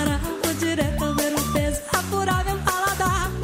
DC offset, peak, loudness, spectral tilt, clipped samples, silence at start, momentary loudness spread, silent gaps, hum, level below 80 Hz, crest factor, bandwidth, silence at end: under 0.1%; -6 dBFS; -23 LUFS; -4 dB/octave; under 0.1%; 0 s; 2 LU; none; none; -32 dBFS; 18 dB; 16.5 kHz; 0 s